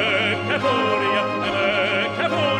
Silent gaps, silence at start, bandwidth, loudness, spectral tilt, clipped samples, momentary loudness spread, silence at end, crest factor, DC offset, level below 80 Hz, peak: none; 0 s; 11.5 kHz; -20 LUFS; -5 dB/octave; under 0.1%; 2 LU; 0 s; 14 dB; under 0.1%; -58 dBFS; -6 dBFS